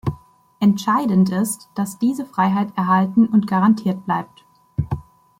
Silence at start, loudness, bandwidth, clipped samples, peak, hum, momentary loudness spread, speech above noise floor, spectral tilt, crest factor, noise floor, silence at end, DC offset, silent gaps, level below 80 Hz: 0.05 s; -19 LUFS; 16 kHz; under 0.1%; -4 dBFS; none; 12 LU; 25 dB; -6.5 dB/octave; 14 dB; -43 dBFS; 0.4 s; under 0.1%; none; -48 dBFS